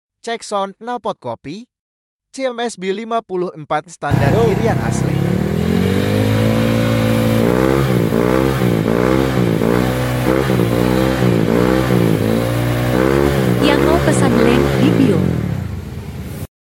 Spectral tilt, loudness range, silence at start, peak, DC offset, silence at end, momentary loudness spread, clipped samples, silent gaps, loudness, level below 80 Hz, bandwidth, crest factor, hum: -6.5 dB/octave; 7 LU; 0.25 s; 0 dBFS; under 0.1%; 0.2 s; 11 LU; under 0.1%; 1.79-2.19 s; -16 LUFS; -32 dBFS; 17 kHz; 14 dB; none